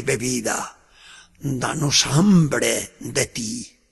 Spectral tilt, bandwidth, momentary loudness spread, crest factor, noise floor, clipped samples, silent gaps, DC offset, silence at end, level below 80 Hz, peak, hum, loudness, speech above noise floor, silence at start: -4 dB/octave; 12.5 kHz; 13 LU; 18 dB; -48 dBFS; under 0.1%; none; under 0.1%; 0.25 s; -50 dBFS; -4 dBFS; none; -20 LUFS; 27 dB; 0 s